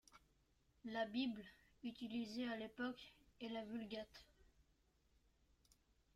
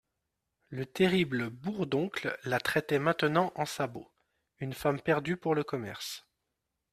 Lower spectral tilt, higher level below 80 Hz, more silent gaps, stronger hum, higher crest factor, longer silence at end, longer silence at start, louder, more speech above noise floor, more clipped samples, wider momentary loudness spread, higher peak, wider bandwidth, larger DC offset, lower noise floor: about the same, -5 dB/octave vs -5.5 dB/octave; second, -78 dBFS vs -66 dBFS; neither; neither; about the same, 18 dB vs 22 dB; first, 1.7 s vs 0.75 s; second, 0.1 s vs 0.7 s; second, -48 LUFS vs -31 LUFS; second, 32 dB vs 53 dB; neither; about the same, 14 LU vs 13 LU; second, -32 dBFS vs -10 dBFS; about the same, 14 kHz vs 15 kHz; neither; second, -79 dBFS vs -84 dBFS